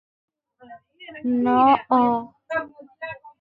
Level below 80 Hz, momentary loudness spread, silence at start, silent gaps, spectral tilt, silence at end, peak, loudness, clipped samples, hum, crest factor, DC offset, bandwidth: -62 dBFS; 22 LU; 0.7 s; none; -7.5 dB/octave; 0.1 s; -4 dBFS; -21 LUFS; under 0.1%; none; 18 dB; under 0.1%; 4.9 kHz